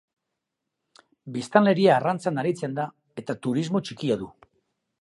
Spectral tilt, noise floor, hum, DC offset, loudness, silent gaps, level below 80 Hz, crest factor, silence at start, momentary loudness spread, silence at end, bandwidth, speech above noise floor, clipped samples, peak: -6.5 dB/octave; -83 dBFS; none; under 0.1%; -24 LUFS; none; -68 dBFS; 24 dB; 1.25 s; 15 LU; 0.75 s; 11.5 kHz; 59 dB; under 0.1%; -2 dBFS